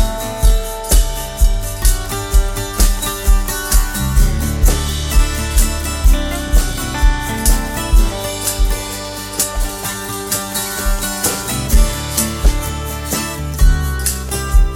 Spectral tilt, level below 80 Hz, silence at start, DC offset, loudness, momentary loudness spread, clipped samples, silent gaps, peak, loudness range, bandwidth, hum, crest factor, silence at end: -3.5 dB/octave; -16 dBFS; 0 s; under 0.1%; -17 LUFS; 5 LU; under 0.1%; none; 0 dBFS; 2 LU; 17.5 kHz; none; 14 dB; 0 s